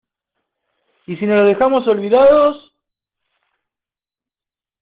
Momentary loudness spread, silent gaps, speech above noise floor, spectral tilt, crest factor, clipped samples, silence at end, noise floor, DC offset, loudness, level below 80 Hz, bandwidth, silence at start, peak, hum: 15 LU; none; over 77 dB; -4.5 dB/octave; 16 dB; under 0.1%; 2.25 s; under -90 dBFS; under 0.1%; -13 LUFS; -54 dBFS; 4.8 kHz; 1.1 s; -2 dBFS; none